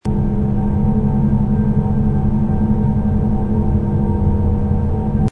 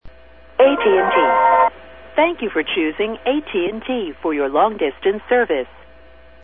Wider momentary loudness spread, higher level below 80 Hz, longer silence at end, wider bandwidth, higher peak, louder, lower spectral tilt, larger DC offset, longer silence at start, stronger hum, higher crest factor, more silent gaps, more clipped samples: second, 2 LU vs 9 LU; first, -22 dBFS vs -50 dBFS; second, 0 s vs 0.8 s; second, 3.5 kHz vs 3.9 kHz; about the same, -2 dBFS vs -2 dBFS; about the same, -17 LUFS vs -18 LUFS; first, -11.5 dB/octave vs -8.5 dB/octave; second, under 0.1% vs 0.5%; about the same, 0.05 s vs 0.05 s; neither; about the same, 12 dB vs 16 dB; neither; neither